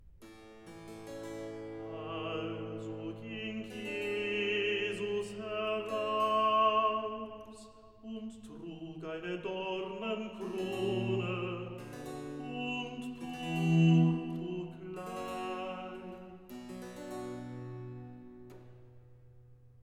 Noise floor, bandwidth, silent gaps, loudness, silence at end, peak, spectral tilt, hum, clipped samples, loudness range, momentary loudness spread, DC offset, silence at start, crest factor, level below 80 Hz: -58 dBFS; 12.5 kHz; none; -35 LUFS; 0.1 s; -16 dBFS; -6.5 dB/octave; none; under 0.1%; 11 LU; 21 LU; under 0.1%; 0 s; 18 dB; -68 dBFS